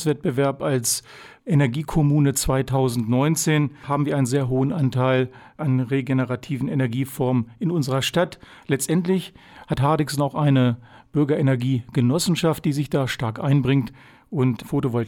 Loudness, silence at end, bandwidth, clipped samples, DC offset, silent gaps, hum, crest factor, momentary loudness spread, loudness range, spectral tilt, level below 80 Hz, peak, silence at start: -22 LUFS; 0 s; 17 kHz; under 0.1%; under 0.1%; none; none; 14 dB; 6 LU; 2 LU; -6 dB/octave; -46 dBFS; -8 dBFS; 0 s